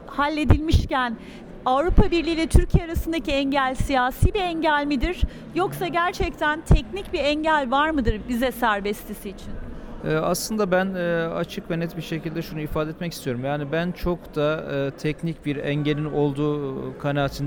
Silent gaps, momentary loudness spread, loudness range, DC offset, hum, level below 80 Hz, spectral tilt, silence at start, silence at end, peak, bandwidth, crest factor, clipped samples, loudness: none; 9 LU; 5 LU; under 0.1%; none; -30 dBFS; -6 dB/octave; 0 s; 0 s; -2 dBFS; over 20 kHz; 20 dB; under 0.1%; -24 LUFS